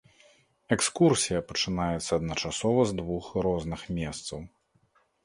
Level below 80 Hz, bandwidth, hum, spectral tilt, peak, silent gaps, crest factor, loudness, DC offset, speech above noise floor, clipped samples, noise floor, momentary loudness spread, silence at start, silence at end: -50 dBFS; 11.5 kHz; none; -4.5 dB/octave; -8 dBFS; none; 22 dB; -28 LUFS; under 0.1%; 40 dB; under 0.1%; -68 dBFS; 11 LU; 0.7 s; 0.8 s